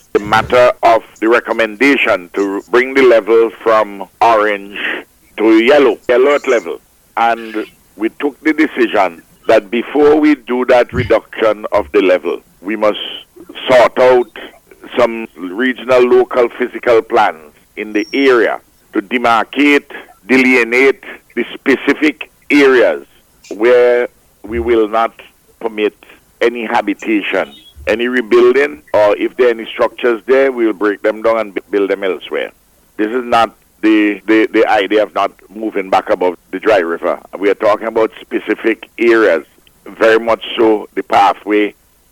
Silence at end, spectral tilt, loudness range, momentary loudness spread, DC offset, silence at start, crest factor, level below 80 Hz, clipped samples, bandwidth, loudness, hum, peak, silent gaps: 0.4 s; -5 dB/octave; 3 LU; 12 LU; under 0.1%; 0.15 s; 12 dB; -46 dBFS; under 0.1%; 17.5 kHz; -13 LUFS; none; -2 dBFS; none